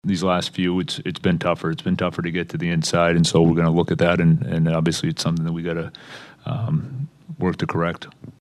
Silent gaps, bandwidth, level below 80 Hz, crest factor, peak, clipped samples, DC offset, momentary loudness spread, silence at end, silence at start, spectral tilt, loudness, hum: none; 12 kHz; -48 dBFS; 18 dB; -2 dBFS; under 0.1%; under 0.1%; 15 LU; 0.1 s; 0.05 s; -6 dB/octave; -21 LUFS; none